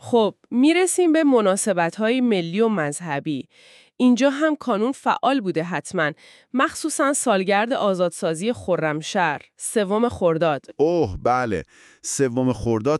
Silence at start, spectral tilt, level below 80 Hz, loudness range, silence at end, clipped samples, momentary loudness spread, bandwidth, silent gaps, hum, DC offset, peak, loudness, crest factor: 0.05 s; -4.5 dB/octave; -52 dBFS; 2 LU; 0 s; under 0.1%; 8 LU; 13.5 kHz; none; none; under 0.1%; -4 dBFS; -21 LUFS; 16 dB